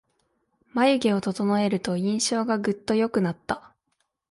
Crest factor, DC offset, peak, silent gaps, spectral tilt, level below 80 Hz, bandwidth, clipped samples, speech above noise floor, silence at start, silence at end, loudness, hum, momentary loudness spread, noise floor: 18 dB; under 0.1%; -8 dBFS; none; -5 dB/octave; -62 dBFS; 11.5 kHz; under 0.1%; 51 dB; 0.75 s; 0.75 s; -25 LUFS; none; 10 LU; -75 dBFS